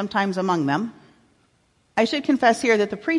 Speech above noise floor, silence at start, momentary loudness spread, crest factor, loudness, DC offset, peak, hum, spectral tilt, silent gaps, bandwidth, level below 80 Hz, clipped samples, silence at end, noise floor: 43 dB; 0 s; 8 LU; 18 dB; -21 LUFS; under 0.1%; -6 dBFS; none; -5 dB/octave; none; 11.5 kHz; -66 dBFS; under 0.1%; 0 s; -64 dBFS